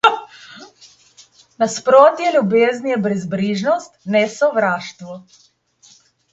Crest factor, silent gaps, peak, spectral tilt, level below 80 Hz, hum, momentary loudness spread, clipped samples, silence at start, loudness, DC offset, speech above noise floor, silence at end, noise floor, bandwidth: 18 dB; none; 0 dBFS; -5 dB/octave; -66 dBFS; none; 23 LU; under 0.1%; 0.05 s; -16 LUFS; under 0.1%; 35 dB; 1.1 s; -52 dBFS; 8.2 kHz